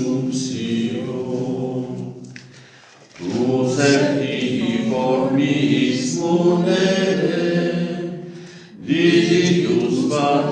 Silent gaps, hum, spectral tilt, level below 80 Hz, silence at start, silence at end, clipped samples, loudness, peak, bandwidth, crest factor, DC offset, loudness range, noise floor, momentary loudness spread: none; none; -5.5 dB/octave; -70 dBFS; 0 s; 0 s; under 0.1%; -19 LUFS; -2 dBFS; 9.6 kHz; 16 dB; under 0.1%; 6 LU; -46 dBFS; 15 LU